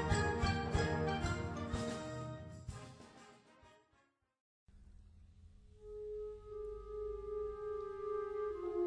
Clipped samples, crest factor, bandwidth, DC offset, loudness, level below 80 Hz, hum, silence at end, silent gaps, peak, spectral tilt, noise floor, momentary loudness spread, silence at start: under 0.1%; 20 dB; 10.5 kHz; under 0.1%; -41 LUFS; -52 dBFS; none; 0 s; 4.40-4.67 s; -22 dBFS; -6 dB/octave; -76 dBFS; 17 LU; 0 s